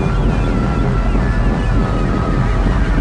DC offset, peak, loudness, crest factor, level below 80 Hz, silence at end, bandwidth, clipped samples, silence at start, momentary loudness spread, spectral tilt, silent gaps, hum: under 0.1%; -2 dBFS; -17 LUFS; 12 dB; -16 dBFS; 0 s; 9 kHz; under 0.1%; 0 s; 1 LU; -8 dB/octave; none; none